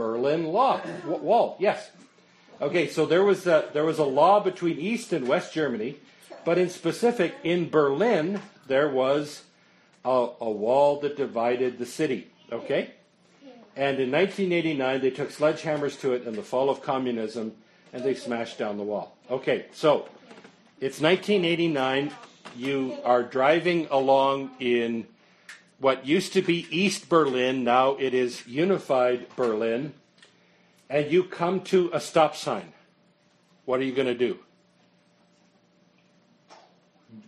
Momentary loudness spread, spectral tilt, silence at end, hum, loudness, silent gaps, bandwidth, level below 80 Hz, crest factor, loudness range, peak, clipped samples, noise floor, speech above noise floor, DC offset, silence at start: 11 LU; -5.5 dB/octave; 0.1 s; none; -25 LUFS; none; 13 kHz; -74 dBFS; 20 dB; 5 LU; -6 dBFS; under 0.1%; -63 dBFS; 38 dB; under 0.1%; 0 s